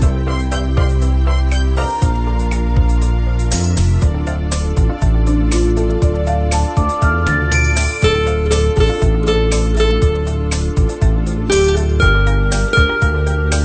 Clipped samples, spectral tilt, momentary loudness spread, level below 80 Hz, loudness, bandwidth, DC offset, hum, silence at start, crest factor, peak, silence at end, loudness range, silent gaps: under 0.1%; -5.5 dB/octave; 4 LU; -16 dBFS; -16 LUFS; 9.2 kHz; under 0.1%; none; 0 s; 12 dB; 0 dBFS; 0 s; 2 LU; none